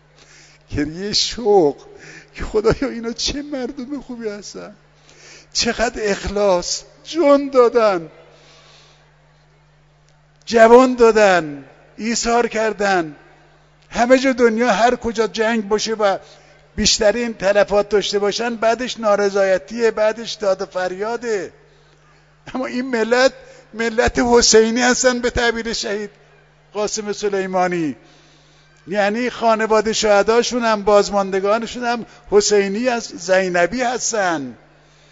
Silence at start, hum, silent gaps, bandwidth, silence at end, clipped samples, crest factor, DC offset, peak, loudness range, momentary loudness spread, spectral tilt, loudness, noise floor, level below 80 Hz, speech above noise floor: 0.7 s; none; none; 8 kHz; 0.55 s; under 0.1%; 18 dB; under 0.1%; 0 dBFS; 7 LU; 14 LU; -3 dB/octave; -17 LUFS; -53 dBFS; -42 dBFS; 36 dB